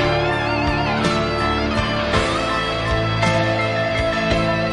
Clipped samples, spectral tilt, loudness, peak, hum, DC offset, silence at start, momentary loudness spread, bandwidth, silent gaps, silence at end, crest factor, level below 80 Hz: under 0.1%; -5.5 dB/octave; -19 LUFS; -4 dBFS; none; under 0.1%; 0 s; 2 LU; 11.5 kHz; none; 0 s; 14 dB; -32 dBFS